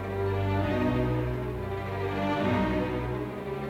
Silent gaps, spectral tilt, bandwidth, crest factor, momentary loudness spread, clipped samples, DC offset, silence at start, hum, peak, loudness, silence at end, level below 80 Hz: none; -8 dB/octave; 14.5 kHz; 14 dB; 6 LU; under 0.1%; under 0.1%; 0 s; none; -16 dBFS; -29 LUFS; 0 s; -42 dBFS